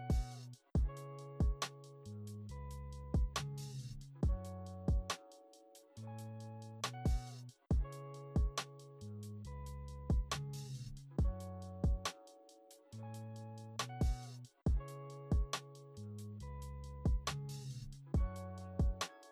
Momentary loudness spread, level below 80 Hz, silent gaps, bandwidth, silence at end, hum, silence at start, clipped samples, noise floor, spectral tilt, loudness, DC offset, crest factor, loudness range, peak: 14 LU; -44 dBFS; none; 14.5 kHz; 0 s; none; 0 s; under 0.1%; -63 dBFS; -5.5 dB/octave; -43 LUFS; under 0.1%; 14 dB; 2 LU; -26 dBFS